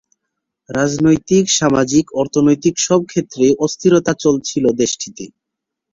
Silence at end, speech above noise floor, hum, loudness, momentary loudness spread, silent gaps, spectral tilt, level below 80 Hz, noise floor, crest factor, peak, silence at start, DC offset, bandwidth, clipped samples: 0.65 s; 65 dB; none; -15 LUFS; 9 LU; none; -4.5 dB/octave; -50 dBFS; -80 dBFS; 14 dB; -2 dBFS; 0.7 s; under 0.1%; 7.8 kHz; under 0.1%